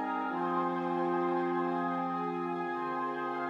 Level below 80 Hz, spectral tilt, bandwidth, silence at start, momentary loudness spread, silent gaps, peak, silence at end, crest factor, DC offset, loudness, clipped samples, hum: -86 dBFS; -8 dB/octave; 6.8 kHz; 0 s; 4 LU; none; -20 dBFS; 0 s; 12 dB; under 0.1%; -33 LUFS; under 0.1%; none